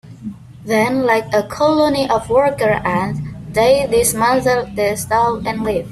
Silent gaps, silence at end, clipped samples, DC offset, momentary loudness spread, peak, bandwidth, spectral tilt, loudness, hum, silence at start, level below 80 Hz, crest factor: none; 0 s; under 0.1%; under 0.1%; 9 LU; -2 dBFS; 15 kHz; -4.5 dB/octave; -16 LUFS; none; 0.05 s; -42 dBFS; 14 dB